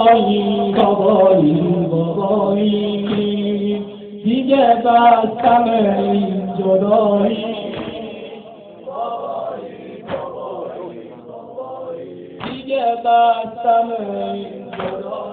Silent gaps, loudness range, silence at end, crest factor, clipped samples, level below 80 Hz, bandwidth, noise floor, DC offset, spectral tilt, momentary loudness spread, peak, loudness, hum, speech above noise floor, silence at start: none; 13 LU; 0 s; 16 dB; under 0.1%; -54 dBFS; 4.4 kHz; -37 dBFS; under 0.1%; -11 dB/octave; 19 LU; 0 dBFS; -16 LUFS; none; 22 dB; 0 s